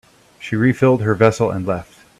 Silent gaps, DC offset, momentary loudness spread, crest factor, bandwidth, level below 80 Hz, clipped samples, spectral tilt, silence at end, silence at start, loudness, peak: none; under 0.1%; 11 LU; 18 dB; 13.5 kHz; -50 dBFS; under 0.1%; -7.5 dB/octave; 0.35 s; 0.4 s; -17 LUFS; 0 dBFS